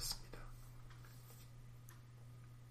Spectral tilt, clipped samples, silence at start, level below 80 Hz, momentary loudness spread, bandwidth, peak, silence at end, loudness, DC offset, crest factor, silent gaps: -2.5 dB/octave; under 0.1%; 0 s; -58 dBFS; 10 LU; 15.5 kHz; -28 dBFS; 0 s; -55 LUFS; under 0.1%; 24 dB; none